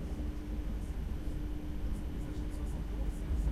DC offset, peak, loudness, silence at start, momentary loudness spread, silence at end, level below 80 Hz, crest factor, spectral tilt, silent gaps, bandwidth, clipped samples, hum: under 0.1%; -22 dBFS; -40 LUFS; 0 s; 2 LU; 0 s; -38 dBFS; 14 dB; -7.5 dB/octave; none; 13 kHz; under 0.1%; none